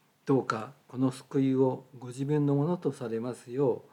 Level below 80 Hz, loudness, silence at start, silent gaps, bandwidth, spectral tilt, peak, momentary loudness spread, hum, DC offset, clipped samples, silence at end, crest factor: -84 dBFS; -30 LUFS; 0.25 s; none; 11.5 kHz; -8 dB/octave; -14 dBFS; 10 LU; none; under 0.1%; under 0.1%; 0.1 s; 16 dB